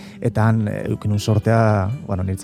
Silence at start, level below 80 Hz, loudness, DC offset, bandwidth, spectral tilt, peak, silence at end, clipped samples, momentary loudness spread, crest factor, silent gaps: 0 s; -50 dBFS; -19 LUFS; under 0.1%; 13.5 kHz; -7.5 dB/octave; -2 dBFS; 0 s; under 0.1%; 8 LU; 16 dB; none